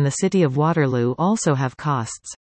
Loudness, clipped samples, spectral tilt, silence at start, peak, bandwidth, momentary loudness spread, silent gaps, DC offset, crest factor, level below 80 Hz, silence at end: -20 LUFS; under 0.1%; -6 dB/octave; 0 s; -6 dBFS; 8.8 kHz; 6 LU; none; under 0.1%; 14 dB; -58 dBFS; 0.1 s